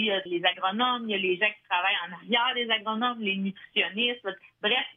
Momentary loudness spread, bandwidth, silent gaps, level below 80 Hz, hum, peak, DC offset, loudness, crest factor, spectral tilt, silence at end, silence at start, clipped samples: 5 LU; 4.1 kHz; none; -82 dBFS; none; -10 dBFS; under 0.1%; -27 LUFS; 18 dB; -6.5 dB/octave; 0.05 s; 0 s; under 0.1%